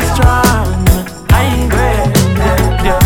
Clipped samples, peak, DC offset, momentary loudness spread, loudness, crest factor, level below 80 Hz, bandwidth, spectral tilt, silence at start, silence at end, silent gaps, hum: 0.1%; 0 dBFS; 0.4%; 3 LU; -12 LUFS; 10 dB; -16 dBFS; 18 kHz; -5.5 dB/octave; 0 s; 0 s; none; none